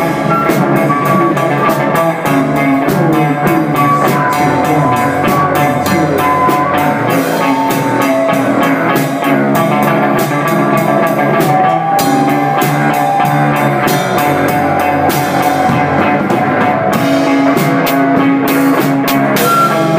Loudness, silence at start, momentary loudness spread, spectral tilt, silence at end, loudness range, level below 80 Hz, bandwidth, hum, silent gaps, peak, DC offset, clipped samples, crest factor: -11 LUFS; 0 s; 2 LU; -6 dB/octave; 0 s; 1 LU; -46 dBFS; 16 kHz; none; none; 0 dBFS; under 0.1%; under 0.1%; 10 dB